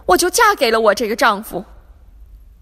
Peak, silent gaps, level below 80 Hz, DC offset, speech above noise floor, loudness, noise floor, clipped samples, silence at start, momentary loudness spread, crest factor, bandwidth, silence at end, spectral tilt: 0 dBFS; none; -42 dBFS; under 0.1%; 27 dB; -14 LUFS; -42 dBFS; under 0.1%; 0.05 s; 14 LU; 16 dB; 16 kHz; 0.25 s; -2 dB/octave